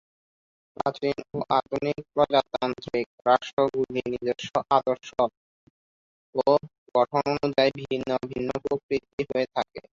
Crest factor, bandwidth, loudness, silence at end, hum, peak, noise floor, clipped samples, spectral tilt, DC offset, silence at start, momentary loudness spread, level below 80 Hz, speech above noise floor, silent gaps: 20 dB; 7.6 kHz; -26 LUFS; 0.15 s; none; -6 dBFS; under -90 dBFS; under 0.1%; -6 dB/octave; under 0.1%; 0.8 s; 7 LU; -60 dBFS; over 64 dB; 3.06-3.18 s, 3.53-3.57 s, 5.37-6.33 s, 6.78-6.86 s, 8.83-8.89 s, 9.13-9.18 s